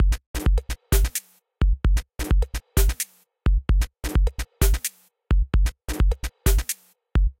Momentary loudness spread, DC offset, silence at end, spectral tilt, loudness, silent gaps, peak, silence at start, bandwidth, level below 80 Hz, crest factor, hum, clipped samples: 5 LU; under 0.1%; 0.1 s; -4.5 dB/octave; -25 LUFS; 0.26-0.34 s; -6 dBFS; 0 s; 17 kHz; -22 dBFS; 16 dB; none; under 0.1%